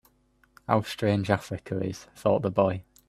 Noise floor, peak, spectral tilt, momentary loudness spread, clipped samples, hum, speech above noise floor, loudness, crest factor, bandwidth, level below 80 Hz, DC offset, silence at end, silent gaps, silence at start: -65 dBFS; -6 dBFS; -7 dB/octave; 9 LU; under 0.1%; none; 39 dB; -27 LUFS; 22 dB; 14 kHz; -60 dBFS; under 0.1%; 0.25 s; none; 0.7 s